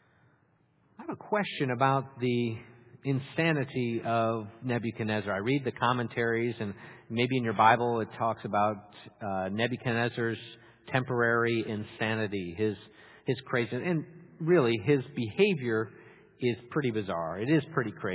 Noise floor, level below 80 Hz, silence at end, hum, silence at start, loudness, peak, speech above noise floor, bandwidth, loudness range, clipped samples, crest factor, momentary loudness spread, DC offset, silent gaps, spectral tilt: -68 dBFS; -64 dBFS; 0 s; none; 1 s; -30 LUFS; -8 dBFS; 38 dB; 4 kHz; 3 LU; under 0.1%; 22 dB; 11 LU; under 0.1%; none; -5 dB/octave